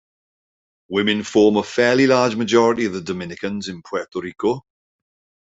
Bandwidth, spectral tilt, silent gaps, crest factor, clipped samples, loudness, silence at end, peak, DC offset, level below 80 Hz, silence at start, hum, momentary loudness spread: 8 kHz; -5 dB/octave; none; 18 dB; under 0.1%; -19 LUFS; 0.8 s; -2 dBFS; under 0.1%; -60 dBFS; 0.9 s; none; 12 LU